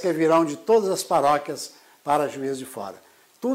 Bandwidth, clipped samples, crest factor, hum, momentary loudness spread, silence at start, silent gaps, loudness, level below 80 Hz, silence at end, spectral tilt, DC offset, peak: 16 kHz; under 0.1%; 14 dB; none; 16 LU; 0 s; none; -23 LUFS; -68 dBFS; 0 s; -4.5 dB/octave; under 0.1%; -10 dBFS